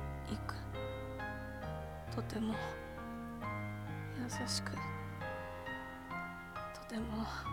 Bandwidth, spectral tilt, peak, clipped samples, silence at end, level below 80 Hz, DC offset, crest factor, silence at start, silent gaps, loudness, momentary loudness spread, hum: 17 kHz; -5 dB/octave; -24 dBFS; under 0.1%; 0 s; -54 dBFS; under 0.1%; 18 dB; 0 s; none; -43 LUFS; 7 LU; none